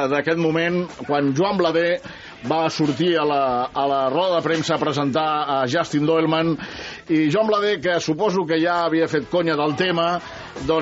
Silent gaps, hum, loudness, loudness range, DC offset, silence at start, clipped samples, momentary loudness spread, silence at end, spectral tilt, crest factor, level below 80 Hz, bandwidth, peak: none; none; -20 LUFS; 1 LU; under 0.1%; 0 s; under 0.1%; 6 LU; 0 s; -4 dB/octave; 16 dB; -54 dBFS; 8 kHz; -4 dBFS